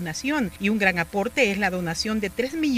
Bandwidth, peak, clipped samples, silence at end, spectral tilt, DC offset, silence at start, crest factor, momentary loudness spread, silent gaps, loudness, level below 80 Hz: 16 kHz; -6 dBFS; under 0.1%; 0 s; -4.5 dB/octave; under 0.1%; 0 s; 20 dB; 5 LU; none; -24 LUFS; -48 dBFS